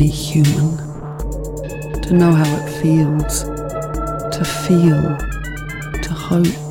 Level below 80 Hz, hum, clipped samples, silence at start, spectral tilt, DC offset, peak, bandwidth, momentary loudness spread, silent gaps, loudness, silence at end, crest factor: -30 dBFS; none; under 0.1%; 0 s; -6.5 dB/octave; under 0.1%; -4 dBFS; 17 kHz; 13 LU; none; -18 LUFS; 0 s; 12 dB